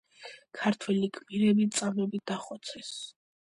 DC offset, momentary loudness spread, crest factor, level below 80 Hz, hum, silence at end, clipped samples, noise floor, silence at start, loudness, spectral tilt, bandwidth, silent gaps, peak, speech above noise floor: under 0.1%; 19 LU; 18 dB; -74 dBFS; none; 0.4 s; under 0.1%; -51 dBFS; 0.2 s; -30 LUFS; -5 dB/octave; 11.5 kHz; none; -14 dBFS; 21 dB